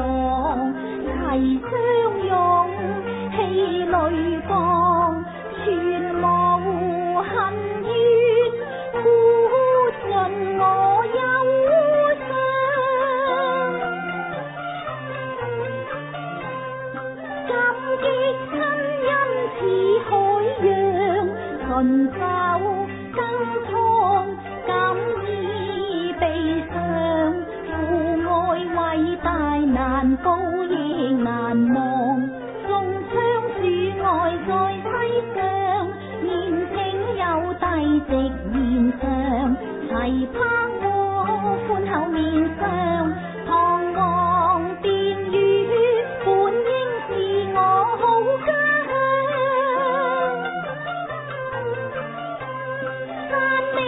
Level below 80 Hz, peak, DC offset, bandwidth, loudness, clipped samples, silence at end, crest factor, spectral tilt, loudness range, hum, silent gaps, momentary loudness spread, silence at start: -42 dBFS; -8 dBFS; under 0.1%; 4 kHz; -21 LUFS; under 0.1%; 0 s; 14 dB; -11 dB/octave; 5 LU; none; none; 10 LU; 0 s